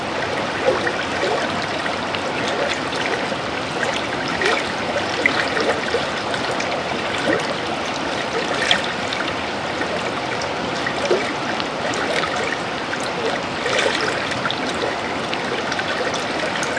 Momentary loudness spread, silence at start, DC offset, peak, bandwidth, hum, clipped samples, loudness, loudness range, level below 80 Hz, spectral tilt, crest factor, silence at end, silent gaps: 4 LU; 0 s; under 0.1%; 0 dBFS; 10.5 kHz; none; under 0.1%; -21 LUFS; 1 LU; -50 dBFS; -3.5 dB/octave; 22 dB; 0 s; none